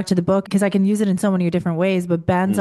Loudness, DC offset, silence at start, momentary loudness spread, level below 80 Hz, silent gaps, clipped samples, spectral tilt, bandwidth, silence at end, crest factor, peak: -19 LUFS; under 0.1%; 0 s; 2 LU; -52 dBFS; none; under 0.1%; -7 dB/octave; 12.5 kHz; 0 s; 14 dB; -4 dBFS